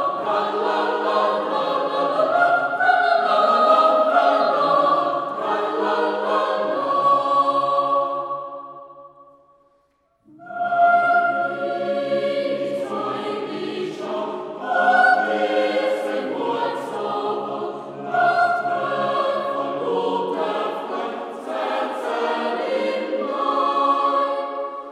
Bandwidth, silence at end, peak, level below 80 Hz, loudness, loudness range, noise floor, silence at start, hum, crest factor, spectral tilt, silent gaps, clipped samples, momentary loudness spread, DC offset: 11.5 kHz; 0 s; -4 dBFS; -74 dBFS; -21 LUFS; 7 LU; -64 dBFS; 0 s; none; 18 dB; -5 dB/octave; none; under 0.1%; 11 LU; under 0.1%